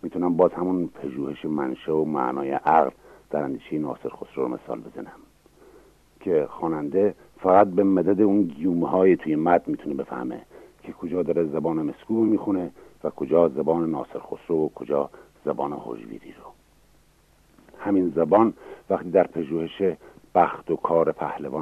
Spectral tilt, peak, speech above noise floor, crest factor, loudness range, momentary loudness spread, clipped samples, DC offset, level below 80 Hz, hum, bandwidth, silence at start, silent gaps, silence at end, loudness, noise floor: -9 dB/octave; -4 dBFS; 35 dB; 20 dB; 9 LU; 15 LU; under 0.1%; under 0.1%; -62 dBFS; none; 8.4 kHz; 0.05 s; none; 0 s; -24 LUFS; -59 dBFS